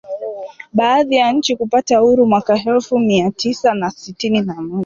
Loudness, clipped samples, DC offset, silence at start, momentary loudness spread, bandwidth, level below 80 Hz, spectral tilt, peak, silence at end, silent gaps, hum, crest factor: -15 LUFS; under 0.1%; under 0.1%; 0.05 s; 11 LU; 7.6 kHz; -54 dBFS; -5 dB/octave; -2 dBFS; 0 s; none; none; 14 dB